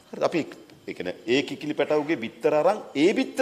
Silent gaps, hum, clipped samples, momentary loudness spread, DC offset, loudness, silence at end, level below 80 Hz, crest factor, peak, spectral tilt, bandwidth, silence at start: none; none; under 0.1%; 12 LU; under 0.1%; -25 LUFS; 0 s; -70 dBFS; 18 dB; -8 dBFS; -5 dB/octave; 14.5 kHz; 0.1 s